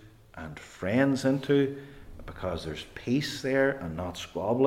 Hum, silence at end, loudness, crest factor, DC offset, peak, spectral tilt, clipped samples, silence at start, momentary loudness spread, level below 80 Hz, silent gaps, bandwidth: none; 0 s; -29 LUFS; 18 dB; under 0.1%; -12 dBFS; -6 dB/octave; under 0.1%; 0 s; 18 LU; -54 dBFS; none; 15.5 kHz